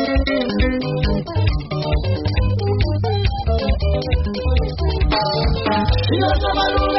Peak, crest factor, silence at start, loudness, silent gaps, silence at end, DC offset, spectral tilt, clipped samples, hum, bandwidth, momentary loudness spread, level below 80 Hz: -6 dBFS; 12 dB; 0 s; -19 LUFS; none; 0 s; under 0.1%; -5 dB/octave; under 0.1%; none; 6 kHz; 3 LU; -22 dBFS